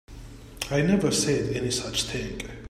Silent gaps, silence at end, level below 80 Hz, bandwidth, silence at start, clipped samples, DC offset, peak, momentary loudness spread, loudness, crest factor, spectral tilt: none; 0.05 s; -44 dBFS; 16 kHz; 0.1 s; under 0.1%; under 0.1%; -10 dBFS; 20 LU; -26 LUFS; 18 dB; -4 dB/octave